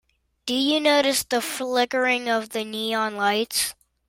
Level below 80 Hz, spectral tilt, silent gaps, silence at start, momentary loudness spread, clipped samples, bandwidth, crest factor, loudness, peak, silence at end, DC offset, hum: -64 dBFS; -1.5 dB/octave; none; 0.45 s; 9 LU; under 0.1%; 16.5 kHz; 16 dB; -23 LUFS; -8 dBFS; 0.35 s; under 0.1%; none